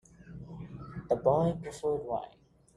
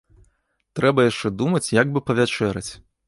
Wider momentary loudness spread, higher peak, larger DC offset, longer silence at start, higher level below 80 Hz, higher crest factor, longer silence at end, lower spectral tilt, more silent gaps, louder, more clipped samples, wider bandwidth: first, 21 LU vs 12 LU; second, -12 dBFS vs -4 dBFS; neither; second, 0.2 s vs 0.75 s; second, -58 dBFS vs -52 dBFS; about the same, 22 dB vs 18 dB; first, 0.45 s vs 0.3 s; first, -8 dB/octave vs -5.5 dB/octave; neither; second, -31 LUFS vs -21 LUFS; neither; about the same, 11.5 kHz vs 11.5 kHz